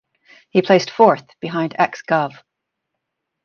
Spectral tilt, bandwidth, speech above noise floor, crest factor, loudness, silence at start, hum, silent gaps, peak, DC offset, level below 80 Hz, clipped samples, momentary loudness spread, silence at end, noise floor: -6 dB/octave; 7 kHz; 61 dB; 18 dB; -18 LUFS; 0.55 s; none; none; 0 dBFS; under 0.1%; -66 dBFS; under 0.1%; 9 LU; 1.15 s; -78 dBFS